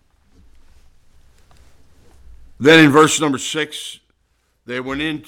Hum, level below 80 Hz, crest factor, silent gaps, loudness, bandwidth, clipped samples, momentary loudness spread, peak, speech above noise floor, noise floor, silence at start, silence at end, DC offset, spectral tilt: none; -50 dBFS; 18 dB; none; -14 LUFS; 16.5 kHz; under 0.1%; 20 LU; 0 dBFS; 49 dB; -64 dBFS; 2.3 s; 0.05 s; under 0.1%; -4 dB/octave